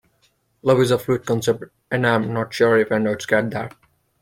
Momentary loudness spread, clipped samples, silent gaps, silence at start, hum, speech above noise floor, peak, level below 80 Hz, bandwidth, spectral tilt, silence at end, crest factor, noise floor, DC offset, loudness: 10 LU; under 0.1%; none; 0.65 s; none; 44 dB; -2 dBFS; -56 dBFS; 16.5 kHz; -6 dB/octave; 0.5 s; 18 dB; -64 dBFS; under 0.1%; -20 LUFS